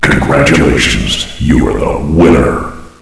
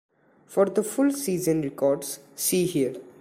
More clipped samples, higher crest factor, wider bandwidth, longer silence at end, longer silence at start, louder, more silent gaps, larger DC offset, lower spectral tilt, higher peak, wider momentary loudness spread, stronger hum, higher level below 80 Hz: first, 0.8% vs under 0.1%; second, 10 dB vs 16 dB; second, 11 kHz vs 16 kHz; about the same, 0.15 s vs 0.1 s; second, 0 s vs 0.5 s; first, -10 LUFS vs -25 LUFS; neither; neither; about the same, -5 dB/octave vs -5 dB/octave; first, 0 dBFS vs -8 dBFS; about the same, 7 LU vs 6 LU; neither; first, -20 dBFS vs -64 dBFS